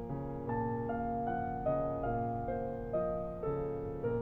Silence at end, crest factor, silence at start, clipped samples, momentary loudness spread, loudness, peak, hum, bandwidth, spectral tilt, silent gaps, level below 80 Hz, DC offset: 0 s; 12 dB; 0 s; under 0.1%; 3 LU; -37 LUFS; -22 dBFS; none; over 20 kHz; -11 dB/octave; none; -50 dBFS; under 0.1%